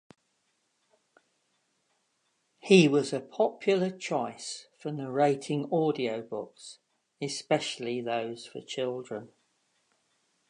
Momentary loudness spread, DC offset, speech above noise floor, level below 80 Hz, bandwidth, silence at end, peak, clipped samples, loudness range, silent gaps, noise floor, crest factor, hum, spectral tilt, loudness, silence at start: 17 LU; under 0.1%; 47 dB; -82 dBFS; 11 kHz; 1.25 s; -6 dBFS; under 0.1%; 7 LU; none; -75 dBFS; 26 dB; none; -5.5 dB/octave; -29 LUFS; 2.65 s